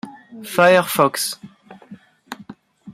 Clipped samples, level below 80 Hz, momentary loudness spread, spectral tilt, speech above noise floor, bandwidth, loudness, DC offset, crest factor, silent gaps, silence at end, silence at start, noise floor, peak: under 0.1%; -66 dBFS; 24 LU; -3.5 dB/octave; 28 dB; 16 kHz; -17 LUFS; under 0.1%; 20 dB; none; 0 s; 0.05 s; -44 dBFS; -2 dBFS